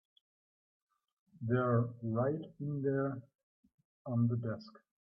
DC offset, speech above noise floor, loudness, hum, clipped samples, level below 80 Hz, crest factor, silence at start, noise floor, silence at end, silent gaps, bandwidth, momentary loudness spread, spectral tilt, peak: under 0.1%; over 55 dB; -36 LUFS; none; under 0.1%; -76 dBFS; 18 dB; 1.4 s; under -90 dBFS; 0.4 s; 3.43-3.63 s, 3.74-3.78 s, 3.85-4.05 s; 5.6 kHz; 13 LU; -11.5 dB/octave; -18 dBFS